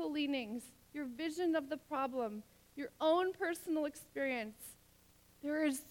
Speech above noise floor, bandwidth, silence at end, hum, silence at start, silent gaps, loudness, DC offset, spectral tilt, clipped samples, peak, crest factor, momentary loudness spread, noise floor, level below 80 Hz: 28 dB; 18 kHz; 0 s; none; 0 s; none; -39 LUFS; under 0.1%; -3.5 dB/octave; under 0.1%; -22 dBFS; 16 dB; 14 LU; -67 dBFS; -74 dBFS